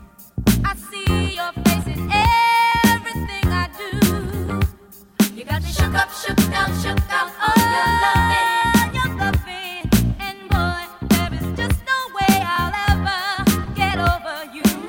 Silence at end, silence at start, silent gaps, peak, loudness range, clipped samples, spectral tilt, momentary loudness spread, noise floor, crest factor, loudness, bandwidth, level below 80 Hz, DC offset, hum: 0 s; 0 s; none; -2 dBFS; 3 LU; under 0.1%; -4.5 dB/octave; 9 LU; -43 dBFS; 18 dB; -19 LUFS; 17 kHz; -30 dBFS; under 0.1%; none